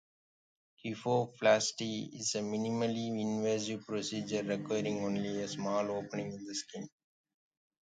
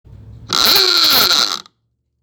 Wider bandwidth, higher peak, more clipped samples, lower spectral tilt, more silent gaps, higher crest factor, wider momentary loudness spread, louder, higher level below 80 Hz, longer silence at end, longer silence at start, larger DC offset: second, 9.4 kHz vs over 20 kHz; second, -14 dBFS vs 0 dBFS; neither; first, -4.5 dB/octave vs 0 dB/octave; neither; first, 22 dB vs 16 dB; about the same, 10 LU vs 10 LU; second, -35 LUFS vs -10 LUFS; second, -76 dBFS vs -46 dBFS; first, 1.05 s vs 0.6 s; first, 0.85 s vs 0.25 s; neither